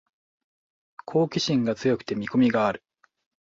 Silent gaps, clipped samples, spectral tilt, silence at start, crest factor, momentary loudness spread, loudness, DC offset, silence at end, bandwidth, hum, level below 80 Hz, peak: none; under 0.1%; -6 dB/octave; 1.1 s; 18 dB; 6 LU; -24 LUFS; under 0.1%; 0.7 s; 7.6 kHz; none; -62 dBFS; -10 dBFS